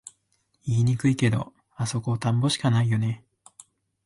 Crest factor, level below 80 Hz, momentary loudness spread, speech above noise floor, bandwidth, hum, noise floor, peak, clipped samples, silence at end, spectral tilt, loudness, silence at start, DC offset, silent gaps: 16 dB; -56 dBFS; 11 LU; 47 dB; 11.5 kHz; none; -71 dBFS; -10 dBFS; under 0.1%; 0.9 s; -6 dB/octave; -25 LUFS; 0.65 s; under 0.1%; none